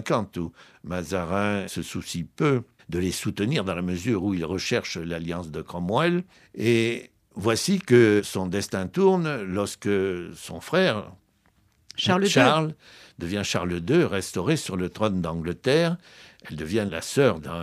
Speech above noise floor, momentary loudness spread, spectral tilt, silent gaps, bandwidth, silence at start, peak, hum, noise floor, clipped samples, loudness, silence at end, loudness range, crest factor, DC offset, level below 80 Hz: 39 dB; 14 LU; -5 dB/octave; none; 15.5 kHz; 0 s; -4 dBFS; none; -64 dBFS; under 0.1%; -25 LUFS; 0 s; 4 LU; 22 dB; under 0.1%; -54 dBFS